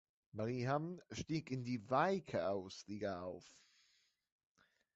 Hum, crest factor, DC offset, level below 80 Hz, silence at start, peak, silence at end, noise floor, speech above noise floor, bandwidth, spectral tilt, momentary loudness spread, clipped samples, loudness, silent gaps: none; 20 dB; under 0.1%; -72 dBFS; 0.35 s; -22 dBFS; 1.45 s; -78 dBFS; 37 dB; 8 kHz; -5.5 dB/octave; 13 LU; under 0.1%; -41 LUFS; none